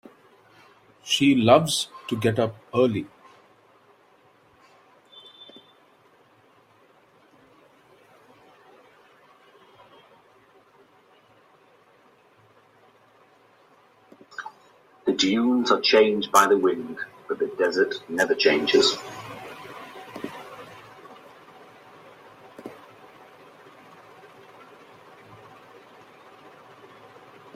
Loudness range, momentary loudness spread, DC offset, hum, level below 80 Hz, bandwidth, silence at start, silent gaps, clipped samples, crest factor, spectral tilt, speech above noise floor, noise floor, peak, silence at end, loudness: 26 LU; 27 LU; under 0.1%; none; -68 dBFS; 16 kHz; 1.05 s; none; under 0.1%; 26 dB; -4 dB/octave; 37 dB; -58 dBFS; -2 dBFS; 4.8 s; -22 LUFS